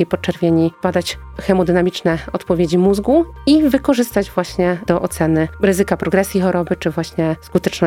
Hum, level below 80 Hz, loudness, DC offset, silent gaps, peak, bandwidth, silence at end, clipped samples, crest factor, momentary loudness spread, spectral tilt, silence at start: none; -38 dBFS; -17 LUFS; under 0.1%; none; 0 dBFS; 17 kHz; 0 s; under 0.1%; 16 dB; 6 LU; -6 dB/octave; 0 s